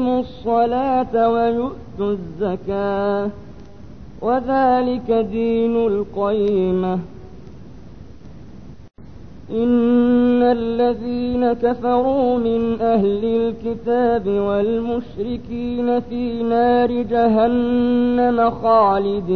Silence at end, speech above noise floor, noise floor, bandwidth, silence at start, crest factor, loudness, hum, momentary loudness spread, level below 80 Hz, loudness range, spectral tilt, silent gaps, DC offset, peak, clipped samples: 0 s; 22 dB; -40 dBFS; 4.9 kHz; 0 s; 14 dB; -19 LUFS; none; 9 LU; -44 dBFS; 6 LU; -9 dB/octave; none; 0.9%; -4 dBFS; under 0.1%